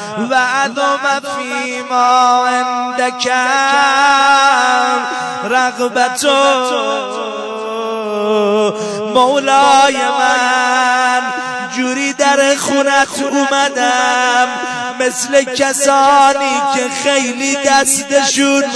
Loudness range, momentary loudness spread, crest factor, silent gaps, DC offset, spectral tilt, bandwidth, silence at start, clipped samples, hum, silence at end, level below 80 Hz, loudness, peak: 3 LU; 10 LU; 12 dB; none; under 0.1%; -1.5 dB/octave; 11 kHz; 0 s; under 0.1%; none; 0 s; -58 dBFS; -12 LUFS; 0 dBFS